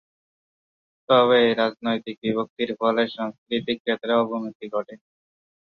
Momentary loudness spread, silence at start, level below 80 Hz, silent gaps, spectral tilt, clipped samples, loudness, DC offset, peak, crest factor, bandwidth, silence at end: 13 LU; 1.1 s; -68 dBFS; 2.17-2.22 s, 2.50-2.56 s, 3.38-3.46 s, 3.80-3.85 s, 4.55-4.60 s; -7 dB/octave; under 0.1%; -23 LUFS; under 0.1%; -4 dBFS; 20 dB; 6 kHz; 0.8 s